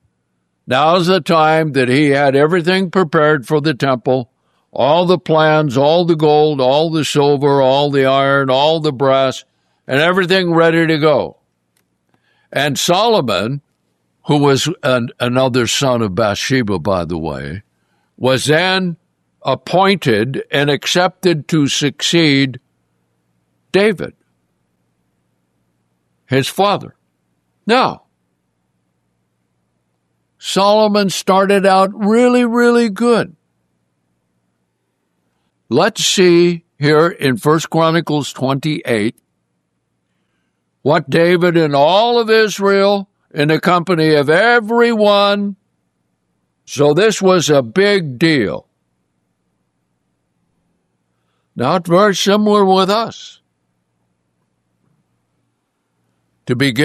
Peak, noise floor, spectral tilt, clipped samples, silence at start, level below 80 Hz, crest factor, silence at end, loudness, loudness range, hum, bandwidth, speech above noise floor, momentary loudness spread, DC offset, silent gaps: 0 dBFS; -68 dBFS; -5 dB/octave; under 0.1%; 0.65 s; -56 dBFS; 14 dB; 0 s; -13 LUFS; 8 LU; none; 14 kHz; 55 dB; 9 LU; under 0.1%; none